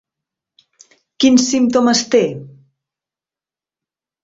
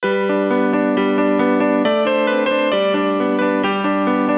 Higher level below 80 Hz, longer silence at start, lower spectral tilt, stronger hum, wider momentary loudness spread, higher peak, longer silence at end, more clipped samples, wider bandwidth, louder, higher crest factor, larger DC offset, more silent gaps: about the same, -60 dBFS vs -58 dBFS; first, 1.2 s vs 0 s; second, -3.5 dB/octave vs -10 dB/octave; neither; first, 8 LU vs 2 LU; about the same, -2 dBFS vs -4 dBFS; first, 1.75 s vs 0 s; neither; first, 8 kHz vs 4 kHz; first, -14 LUFS vs -17 LUFS; about the same, 16 dB vs 12 dB; neither; neither